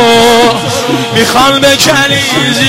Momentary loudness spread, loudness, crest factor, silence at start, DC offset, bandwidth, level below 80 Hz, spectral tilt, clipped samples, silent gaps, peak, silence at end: 7 LU; -7 LUFS; 8 dB; 0 s; under 0.1%; 16.5 kHz; -38 dBFS; -3 dB/octave; 0.3%; none; 0 dBFS; 0 s